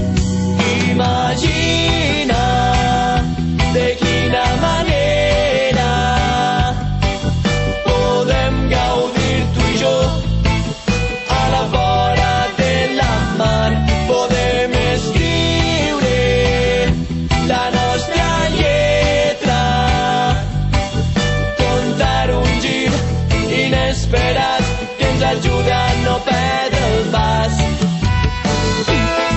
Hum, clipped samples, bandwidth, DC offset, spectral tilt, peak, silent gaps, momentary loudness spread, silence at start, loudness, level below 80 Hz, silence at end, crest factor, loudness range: none; under 0.1%; 8.4 kHz; under 0.1%; -5 dB/octave; -4 dBFS; none; 3 LU; 0 s; -15 LUFS; -24 dBFS; 0 s; 12 dB; 1 LU